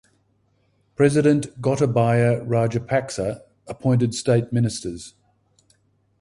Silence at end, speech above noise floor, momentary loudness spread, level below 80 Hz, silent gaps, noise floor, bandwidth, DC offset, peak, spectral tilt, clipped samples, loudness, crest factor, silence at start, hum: 1.1 s; 44 dB; 18 LU; -52 dBFS; none; -65 dBFS; 11.5 kHz; under 0.1%; -4 dBFS; -6.5 dB/octave; under 0.1%; -21 LUFS; 18 dB; 1 s; none